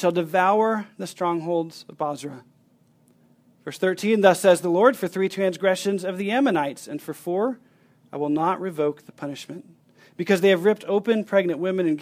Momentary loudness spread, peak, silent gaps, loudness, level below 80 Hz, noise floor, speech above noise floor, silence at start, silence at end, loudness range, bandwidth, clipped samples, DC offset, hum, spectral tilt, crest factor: 17 LU; -2 dBFS; none; -22 LUFS; -74 dBFS; -60 dBFS; 38 dB; 0 s; 0 s; 7 LU; 16 kHz; under 0.1%; under 0.1%; none; -5.5 dB/octave; 22 dB